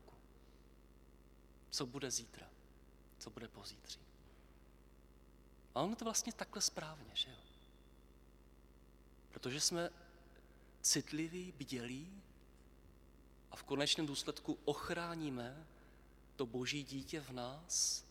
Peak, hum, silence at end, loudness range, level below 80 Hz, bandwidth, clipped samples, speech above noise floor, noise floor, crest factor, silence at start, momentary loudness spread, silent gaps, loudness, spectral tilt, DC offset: -22 dBFS; 50 Hz at -65 dBFS; 0 s; 7 LU; -66 dBFS; 19 kHz; under 0.1%; 21 dB; -64 dBFS; 24 dB; 0 s; 21 LU; none; -41 LUFS; -2.5 dB/octave; under 0.1%